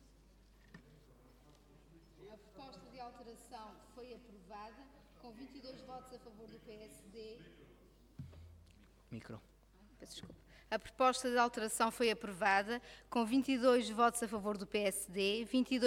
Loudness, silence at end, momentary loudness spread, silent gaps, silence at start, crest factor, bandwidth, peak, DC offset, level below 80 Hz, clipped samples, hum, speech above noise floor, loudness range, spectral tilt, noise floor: -35 LUFS; 0 s; 23 LU; none; 0.75 s; 22 dB; 16.5 kHz; -18 dBFS; under 0.1%; -66 dBFS; under 0.1%; none; 27 dB; 21 LU; -3.5 dB/octave; -65 dBFS